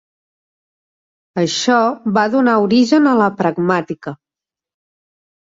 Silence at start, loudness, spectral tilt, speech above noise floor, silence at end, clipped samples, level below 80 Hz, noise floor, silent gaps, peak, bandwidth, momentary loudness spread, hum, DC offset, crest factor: 1.35 s; -15 LUFS; -5 dB/octave; 74 dB; 1.35 s; under 0.1%; -60 dBFS; -88 dBFS; none; -2 dBFS; 7.8 kHz; 15 LU; none; under 0.1%; 16 dB